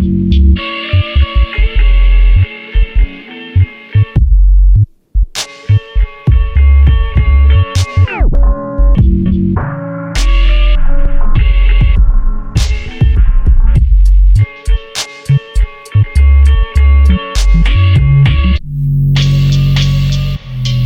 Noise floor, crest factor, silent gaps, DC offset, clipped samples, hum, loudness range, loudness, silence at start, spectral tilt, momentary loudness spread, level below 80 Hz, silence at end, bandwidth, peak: -28 dBFS; 8 dB; none; under 0.1%; under 0.1%; none; 3 LU; -12 LUFS; 0 s; -6.5 dB/octave; 8 LU; -10 dBFS; 0 s; 9.6 kHz; 0 dBFS